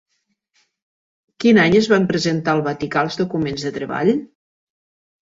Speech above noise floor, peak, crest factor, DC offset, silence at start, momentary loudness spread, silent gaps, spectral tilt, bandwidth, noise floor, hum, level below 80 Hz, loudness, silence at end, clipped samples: 53 dB; -2 dBFS; 18 dB; under 0.1%; 1.4 s; 10 LU; none; -6 dB/octave; 7.8 kHz; -70 dBFS; none; -54 dBFS; -18 LUFS; 1.15 s; under 0.1%